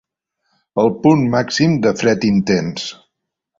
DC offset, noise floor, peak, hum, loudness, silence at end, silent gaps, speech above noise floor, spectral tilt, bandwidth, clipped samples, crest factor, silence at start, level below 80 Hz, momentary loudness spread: under 0.1%; -76 dBFS; -2 dBFS; none; -16 LUFS; 0.65 s; none; 61 dB; -6 dB/octave; 7.8 kHz; under 0.1%; 16 dB; 0.75 s; -50 dBFS; 11 LU